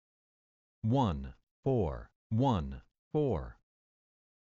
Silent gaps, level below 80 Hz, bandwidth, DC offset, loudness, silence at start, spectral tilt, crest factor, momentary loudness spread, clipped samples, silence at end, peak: 1.43-1.63 s, 2.16-2.30 s, 2.99-3.11 s; -50 dBFS; 7.4 kHz; under 0.1%; -33 LUFS; 0.85 s; -8.5 dB/octave; 18 dB; 16 LU; under 0.1%; 1.05 s; -18 dBFS